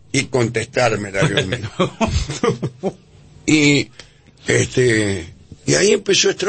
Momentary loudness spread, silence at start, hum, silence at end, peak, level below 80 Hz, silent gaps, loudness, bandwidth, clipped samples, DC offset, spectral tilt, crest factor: 13 LU; 0.15 s; none; 0 s; -2 dBFS; -38 dBFS; none; -18 LUFS; 8.8 kHz; under 0.1%; under 0.1%; -4 dB/octave; 16 dB